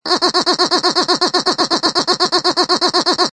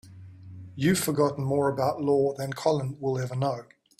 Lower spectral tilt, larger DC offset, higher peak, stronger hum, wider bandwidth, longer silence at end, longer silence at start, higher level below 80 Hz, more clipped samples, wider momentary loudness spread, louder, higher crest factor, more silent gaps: second, -1.5 dB/octave vs -6 dB/octave; neither; first, 0 dBFS vs -10 dBFS; neither; second, 10.5 kHz vs 16 kHz; second, 0.05 s vs 0.35 s; about the same, 0.05 s vs 0.05 s; about the same, -58 dBFS vs -62 dBFS; neither; second, 1 LU vs 11 LU; first, -14 LUFS vs -27 LUFS; about the same, 14 dB vs 18 dB; neither